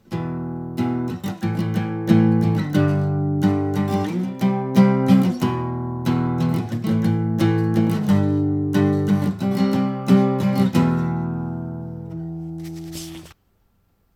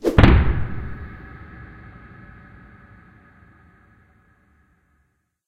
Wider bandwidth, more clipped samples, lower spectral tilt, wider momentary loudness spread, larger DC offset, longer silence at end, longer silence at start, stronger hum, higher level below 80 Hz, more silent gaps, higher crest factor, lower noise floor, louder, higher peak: first, 16 kHz vs 8.8 kHz; neither; about the same, -8 dB/octave vs -8 dB/octave; second, 14 LU vs 30 LU; neither; second, 0.85 s vs 3.8 s; about the same, 0.1 s vs 0.05 s; neither; second, -52 dBFS vs -26 dBFS; neither; second, 16 dB vs 22 dB; second, -63 dBFS vs -68 dBFS; about the same, -20 LUFS vs -19 LUFS; second, -4 dBFS vs 0 dBFS